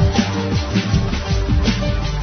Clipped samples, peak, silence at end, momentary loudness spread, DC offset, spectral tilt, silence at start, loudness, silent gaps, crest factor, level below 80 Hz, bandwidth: under 0.1%; -4 dBFS; 0 s; 3 LU; under 0.1%; -6 dB/octave; 0 s; -19 LUFS; none; 14 dB; -22 dBFS; 6.6 kHz